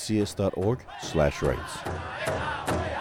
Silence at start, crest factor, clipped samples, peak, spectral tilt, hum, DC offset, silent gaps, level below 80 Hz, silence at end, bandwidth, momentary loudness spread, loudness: 0 s; 16 dB; under 0.1%; -12 dBFS; -5.5 dB/octave; none; under 0.1%; none; -44 dBFS; 0 s; 17.5 kHz; 8 LU; -29 LUFS